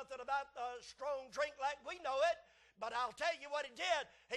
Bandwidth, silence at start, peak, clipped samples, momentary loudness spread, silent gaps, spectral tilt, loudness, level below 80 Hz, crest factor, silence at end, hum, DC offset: 12 kHz; 0 s; -22 dBFS; under 0.1%; 10 LU; none; -1 dB/octave; -41 LUFS; -76 dBFS; 18 dB; 0 s; none; under 0.1%